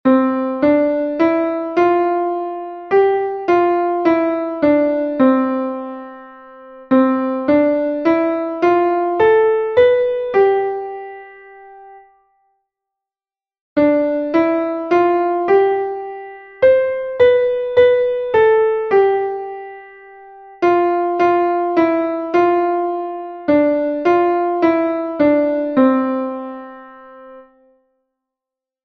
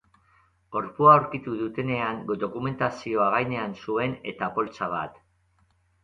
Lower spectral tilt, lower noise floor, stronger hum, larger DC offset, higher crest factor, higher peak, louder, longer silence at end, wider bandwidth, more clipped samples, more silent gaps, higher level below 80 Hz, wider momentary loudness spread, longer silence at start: about the same, -7.5 dB/octave vs -7.5 dB/octave; first, under -90 dBFS vs -66 dBFS; neither; neither; second, 14 dB vs 24 dB; about the same, -2 dBFS vs -4 dBFS; first, -16 LUFS vs -25 LUFS; first, 1.45 s vs 0.95 s; second, 6.2 kHz vs 7.6 kHz; neither; first, 13.61-13.76 s vs none; first, -56 dBFS vs -62 dBFS; about the same, 12 LU vs 14 LU; second, 0.05 s vs 0.7 s